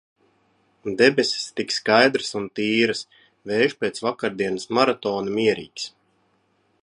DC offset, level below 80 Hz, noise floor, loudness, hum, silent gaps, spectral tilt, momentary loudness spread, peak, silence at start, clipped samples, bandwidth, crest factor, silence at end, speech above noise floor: under 0.1%; -66 dBFS; -66 dBFS; -22 LUFS; none; none; -4 dB/octave; 15 LU; -2 dBFS; 0.85 s; under 0.1%; 11 kHz; 22 dB; 0.95 s; 44 dB